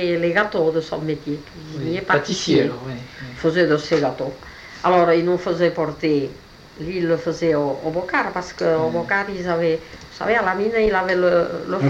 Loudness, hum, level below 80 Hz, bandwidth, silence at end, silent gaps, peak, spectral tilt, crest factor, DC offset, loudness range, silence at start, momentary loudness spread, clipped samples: -20 LUFS; none; -48 dBFS; 8.6 kHz; 0 s; none; -4 dBFS; -6 dB/octave; 16 dB; under 0.1%; 2 LU; 0 s; 12 LU; under 0.1%